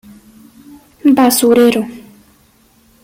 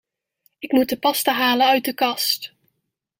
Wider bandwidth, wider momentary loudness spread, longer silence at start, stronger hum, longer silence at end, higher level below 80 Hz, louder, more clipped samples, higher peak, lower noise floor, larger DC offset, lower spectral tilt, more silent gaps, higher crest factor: about the same, 16.5 kHz vs 16.5 kHz; about the same, 10 LU vs 8 LU; first, 1.05 s vs 0.6 s; neither; first, 1.05 s vs 0.7 s; first, -54 dBFS vs -68 dBFS; first, -11 LUFS vs -19 LUFS; neither; first, -2 dBFS vs -6 dBFS; second, -51 dBFS vs -77 dBFS; neither; first, -3.5 dB/octave vs -2 dB/octave; neither; about the same, 14 dB vs 16 dB